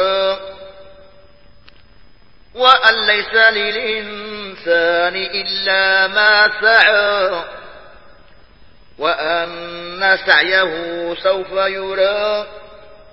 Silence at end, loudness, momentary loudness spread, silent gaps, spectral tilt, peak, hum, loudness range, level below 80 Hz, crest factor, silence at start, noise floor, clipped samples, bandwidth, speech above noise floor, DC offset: 0.35 s; -14 LUFS; 15 LU; none; -4 dB/octave; 0 dBFS; none; 4 LU; -52 dBFS; 18 dB; 0 s; -49 dBFS; under 0.1%; 8 kHz; 34 dB; 0.6%